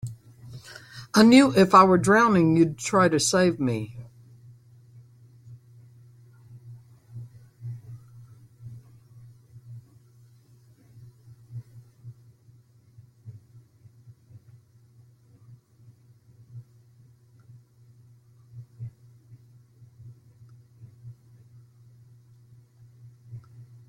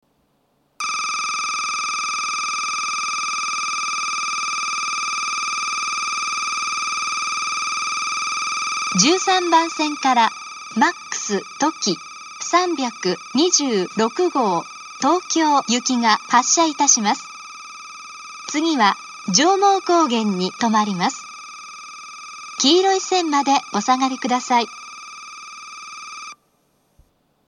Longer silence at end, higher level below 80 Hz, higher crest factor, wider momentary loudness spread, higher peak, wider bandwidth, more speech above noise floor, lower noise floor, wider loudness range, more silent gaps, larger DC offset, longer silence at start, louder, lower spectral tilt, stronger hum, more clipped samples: second, 0.5 s vs 1.15 s; first, -64 dBFS vs -74 dBFS; about the same, 24 dB vs 20 dB; first, 31 LU vs 19 LU; second, -4 dBFS vs 0 dBFS; first, 16 kHz vs 12.5 kHz; second, 38 dB vs 46 dB; second, -56 dBFS vs -64 dBFS; first, 30 LU vs 4 LU; neither; neither; second, 0.05 s vs 0.8 s; about the same, -19 LUFS vs -19 LUFS; first, -5 dB/octave vs -2 dB/octave; neither; neither